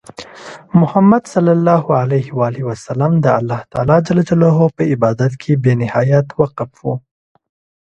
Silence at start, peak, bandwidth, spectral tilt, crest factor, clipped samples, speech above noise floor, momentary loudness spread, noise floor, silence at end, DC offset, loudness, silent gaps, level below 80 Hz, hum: 0.2 s; 0 dBFS; 8.8 kHz; -8.5 dB/octave; 14 dB; under 0.1%; 22 dB; 12 LU; -35 dBFS; 0.9 s; under 0.1%; -14 LUFS; none; -48 dBFS; none